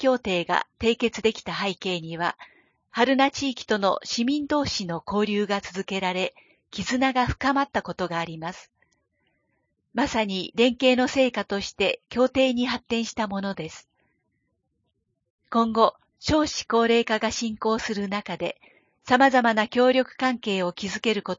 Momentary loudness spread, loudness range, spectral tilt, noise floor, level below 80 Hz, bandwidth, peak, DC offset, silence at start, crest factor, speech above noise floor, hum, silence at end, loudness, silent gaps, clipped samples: 11 LU; 5 LU; -4 dB/octave; -75 dBFS; -52 dBFS; 7.6 kHz; -4 dBFS; under 0.1%; 0 s; 22 dB; 51 dB; none; 0.05 s; -24 LUFS; 15.30-15.39 s; under 0.1%